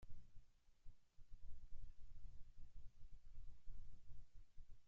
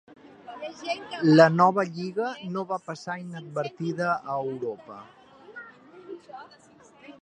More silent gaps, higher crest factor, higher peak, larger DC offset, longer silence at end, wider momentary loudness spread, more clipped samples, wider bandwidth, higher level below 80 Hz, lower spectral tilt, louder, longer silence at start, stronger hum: neither; second, 12 dB vs 26 dB; second, -38 dBFS vs -2 dBFS; neither; about the same, 0 s vs 0.1 s; second, 3 LU vs 26 LU; neither; second, 1.4 kHz vs 9.4 kHz; first, -58 dBFS vs -74 dBFS; about the same, -6 dB/octave vs -7 dB/octave; second, -67 LUFS vs -25 LUFS; about the same, 0 s vs 0.1 s; neither